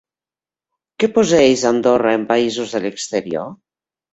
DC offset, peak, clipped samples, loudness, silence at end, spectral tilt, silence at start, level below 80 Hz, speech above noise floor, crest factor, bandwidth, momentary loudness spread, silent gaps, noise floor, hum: under 0.1%; -2 dBFS; under 0.1%; -17 LUFS; 0.6 s; -4 dB/octave; 1 s; -56 dBFS; over 74 dB; 16 dB; 8.2 kHz; 11 LU; none; under -90 dBFS; none